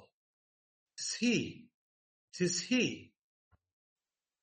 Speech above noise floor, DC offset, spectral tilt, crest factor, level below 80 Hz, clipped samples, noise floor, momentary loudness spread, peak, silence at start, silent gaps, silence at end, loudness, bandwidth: over 57 dB; under 0.1%; -3.5 dB/octave; 20 dB; -78 dBFS; under 0.1%; under -90 dBFS; 18 LU; -18 dBFS; 1 s; 1.74-2.28 s; 1.35 s; -34 LUFS; 8.4 kHz